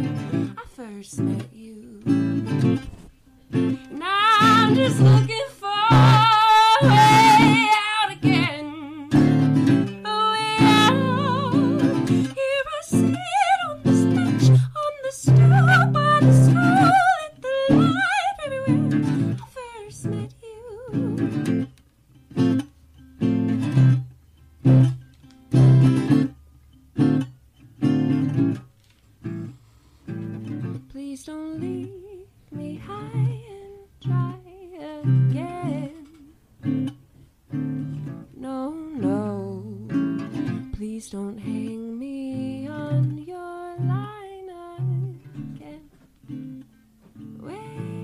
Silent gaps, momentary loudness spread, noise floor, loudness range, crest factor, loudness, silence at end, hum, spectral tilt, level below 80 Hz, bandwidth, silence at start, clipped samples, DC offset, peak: none; 22 LU; -56 dBFS; 16 LU; 14 dB; -20 LUFS; 0 s; none; -6.5 dB/octave; -50 dBFS; 12.5 kHz; 0 s; under 0.1%; under 0.1%; -8 dBFS